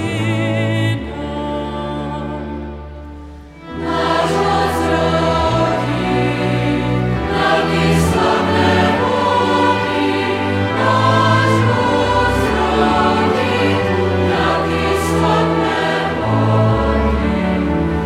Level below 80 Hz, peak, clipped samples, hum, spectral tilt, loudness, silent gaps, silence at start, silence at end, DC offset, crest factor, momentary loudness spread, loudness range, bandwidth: -30 dBFS; -2 dBFS; under 0.1%; none; -6 dB/octave; -16 LUFS; none; 0 s; 0 s; under 0.1%; 14 dB; 10 LU; 7 LU; 15 kHz